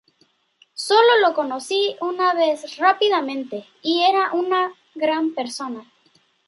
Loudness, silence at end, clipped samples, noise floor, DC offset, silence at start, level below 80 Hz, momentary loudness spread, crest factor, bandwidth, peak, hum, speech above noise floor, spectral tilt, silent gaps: -20 LUFS; 0.65 s; under 0.1%; -63 dBFS; under 0.1%; 0.75 s; -80 dBFS; 14 LU; 18 dB; 11.5 kHz; -2 dBFS; none; 43 dB; -2 dB/octave; none